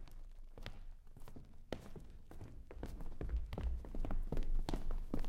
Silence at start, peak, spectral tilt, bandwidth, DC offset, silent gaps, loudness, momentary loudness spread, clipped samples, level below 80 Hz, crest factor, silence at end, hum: 0 s; -20 dBFS; -7 dB/octave; 7.8 kHz; under 0.1%; none; -48 LUFS; 16 LU; under 0.1%; -42 dBFS; 20 dB; 0 s; none